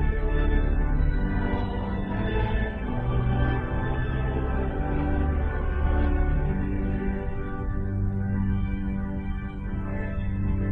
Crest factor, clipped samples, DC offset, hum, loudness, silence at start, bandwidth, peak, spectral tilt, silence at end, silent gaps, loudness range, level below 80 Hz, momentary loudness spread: 14 dB; under 0.1%; under 0.1%; none; -28 LUFS; 0 s; 4.2 kHz; -12 dBFS; -10.5 dB/octave; 0 s; none; 2 LU; -28 dBFS; 6 LU